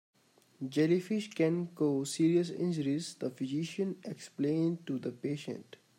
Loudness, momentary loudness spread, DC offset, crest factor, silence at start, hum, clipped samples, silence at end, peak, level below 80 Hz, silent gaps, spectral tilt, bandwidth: -33 LUFS; 11 LU; under 0.1%; 16 dB; 0.6 s; none; under 0.1%; 0.35 s; -16 dBFS; -82 dBFS; none; -6.5 dB/octave; 15.5 kHz